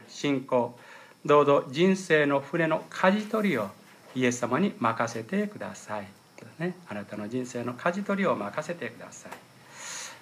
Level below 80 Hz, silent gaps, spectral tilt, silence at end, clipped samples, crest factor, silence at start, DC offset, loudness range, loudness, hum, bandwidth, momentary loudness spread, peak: -80 dBFS; none; -5.5 dB/octave; 0.05 s; under 0.1%; 20 dB; 0 s; under 0.1%; 7 LU; -28 LUFS; none; 15 kHz; 16 LU; -8 dBFS